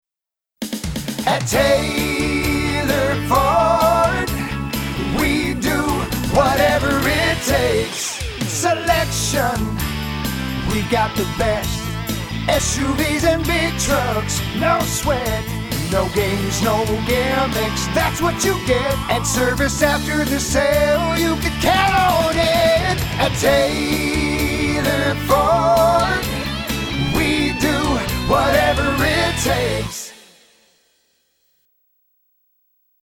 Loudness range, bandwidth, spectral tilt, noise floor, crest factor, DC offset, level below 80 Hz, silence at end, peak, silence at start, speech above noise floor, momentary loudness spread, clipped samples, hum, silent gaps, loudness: 4 LU; over 20 kHz; -4 dB/octave; -87 dBFS; 16 dB; under 0.1%; -30 dBFS; 2.9 s; -2 dBFS; 0.6 s; 70 dB; 8 LU; under 0.1%; none; none; -18 LUFS